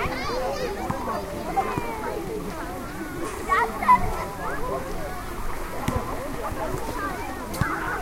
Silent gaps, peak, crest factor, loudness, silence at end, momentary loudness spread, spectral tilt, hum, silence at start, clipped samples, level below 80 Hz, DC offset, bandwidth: none; -6 dBFS; 20 dB; -27 LUFS; 0 s; 12 LU; -5 dB/octave; none; 0 s; under 0.1%; -36 dBFS; under 0.1%; 16 kHz